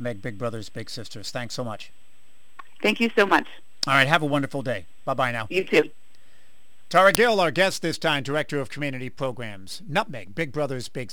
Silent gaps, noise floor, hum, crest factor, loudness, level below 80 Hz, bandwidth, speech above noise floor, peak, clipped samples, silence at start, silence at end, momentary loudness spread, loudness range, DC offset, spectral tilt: none; -62 dBFS; none; 26 dB; -24 LUFS; -60 dBFS; 19 kHz; 37 dB; 0 dBFS; under 0.1%; 0 s; 0 s; 16 LU; 5 LU; 2%; -4.5 dB/octave